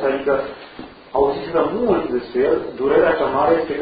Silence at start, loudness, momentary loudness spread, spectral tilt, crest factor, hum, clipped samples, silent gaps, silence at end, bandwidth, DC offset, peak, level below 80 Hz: 0 s; -19 LUFS; 13 LU; -11 dB/octave; 14 dB; none; under 0.1%; none; 0 s; 5 kHz; under 0.1%; -4 dBFS; -46 dBFS